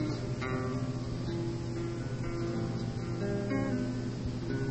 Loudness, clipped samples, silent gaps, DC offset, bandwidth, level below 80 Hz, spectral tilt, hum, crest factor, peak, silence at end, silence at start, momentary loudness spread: -35 LUFS; under 0.1%; none; under 0.1%; 8.4 kHz; -48 dBFS; -7 dB/octave; none; 14 dB; -20 dBFS; 0 s; 0 s; 4 LU